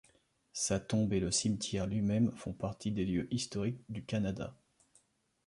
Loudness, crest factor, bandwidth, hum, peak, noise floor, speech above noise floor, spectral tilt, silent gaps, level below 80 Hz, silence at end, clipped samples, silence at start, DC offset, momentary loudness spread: -35 LUFS; 16 dB; 11.5 kHz; none; -20 dBFS; -71 dBFS; 37 dB; -5 dB/octave; none; -56 dBFS; 0.95 s; under 0.1%; 0.55 s; under 0.1%; 9 LU